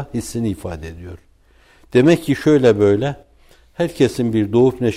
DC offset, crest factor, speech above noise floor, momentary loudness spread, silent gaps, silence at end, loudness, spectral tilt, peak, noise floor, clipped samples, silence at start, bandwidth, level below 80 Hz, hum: under 0.1%; 14 dB; 35 dB; 19 LU; none; 0 s; -17 LUFS; -7 dB/octave; -4 dBFS; -52 dBFS; under 0.1%; 0 s; 15.5 kHz; -44 dBFS; none